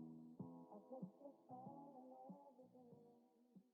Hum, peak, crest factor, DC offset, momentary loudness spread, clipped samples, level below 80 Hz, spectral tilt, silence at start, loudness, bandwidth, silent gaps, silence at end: none; -42 dBFS; 18 dB; under 0.1%; 10 LU; under 0.1%; under -90 dBFS; -11 dB/octave; 0 s; -61 LUFS; 4.2 kHz; none; 0 s